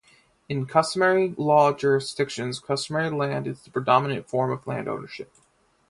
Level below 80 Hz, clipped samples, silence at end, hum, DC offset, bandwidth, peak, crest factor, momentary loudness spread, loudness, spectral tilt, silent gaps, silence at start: -64 dBFS; under 0.1%; 0.65 s; none; under 0.1%; 11.5 kHz; -4 dBFS; 22 dB; 12 LU; -24 LUFS; -5.5 dB/octave; none; 0.5 s